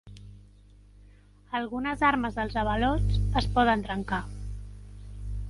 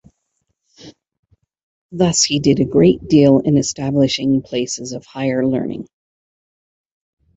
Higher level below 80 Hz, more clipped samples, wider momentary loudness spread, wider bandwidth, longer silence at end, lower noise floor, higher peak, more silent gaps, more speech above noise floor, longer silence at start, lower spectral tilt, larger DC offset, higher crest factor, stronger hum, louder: first, -36 dBFS vs -48 dBFS; neither; first, 21 LU vs 13 LU; first, 11.5 kHz vs 8.2 kHz; second, 0 s vs 1.5 s; second, -54 dBFS vs -71 dBFS; second, -8 dBFS vs -2 dBFS; second, none vs 1.19-1.23 s, 1.63-1.89 s; second, 28 dB vs 56 dB; second, 0.05 s vs 0.85 s; first, -7 dB/octave vs -5 dB/octave; neither; about the same, 20 dB vs 16 dB; first, 50 Hz at -35 dBFS vs none; second, -28 LUFS vs -16 LUFS